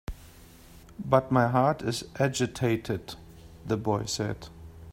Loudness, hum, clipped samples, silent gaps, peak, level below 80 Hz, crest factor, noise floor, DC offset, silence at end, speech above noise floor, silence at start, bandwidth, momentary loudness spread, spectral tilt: -28 LUFS; none; under 0.1%; none; -6 dBFS; -50 dBFS; 24 dB; -51 dBFS; under 0.1%; 0 s; 24 dB; 0.1 s; 16 kHz; 22 LU; -5.5 dB/octave